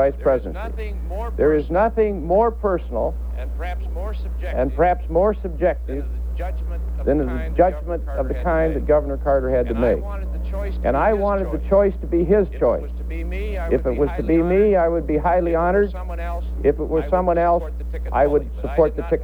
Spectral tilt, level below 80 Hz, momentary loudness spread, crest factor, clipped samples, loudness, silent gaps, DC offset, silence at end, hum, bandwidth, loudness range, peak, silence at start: -9.5 dB/octave; -26 dBFS; 10 LU; 16 dB; under 0.1%; -21 LUFS; none; under 0.1%; 0 s; none; 4.6 kHz; 3 LU; -4 dBFS; 0 s